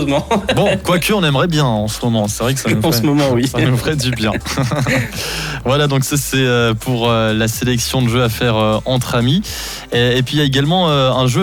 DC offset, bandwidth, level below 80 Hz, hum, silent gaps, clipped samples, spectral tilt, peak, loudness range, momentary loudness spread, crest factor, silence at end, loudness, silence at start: under 0.1%; 19 kHz; -34 dBFS; none; none; under 0.1%; -5 dB/octave; -4 dBFS; 1 LU; 4 LU; 10 dB; 0 s; -15 LUFS; 0 s